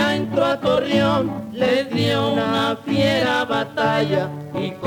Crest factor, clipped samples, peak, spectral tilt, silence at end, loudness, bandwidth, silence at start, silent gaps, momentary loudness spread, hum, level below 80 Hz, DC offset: 14 dB; under 0.1%; -6 dBFS; -6 dB/octave; 0 s; -20 LUFS; 18.5 kHz; 0 s; none; 5 LU; none; -54 dBFS; under 0.1%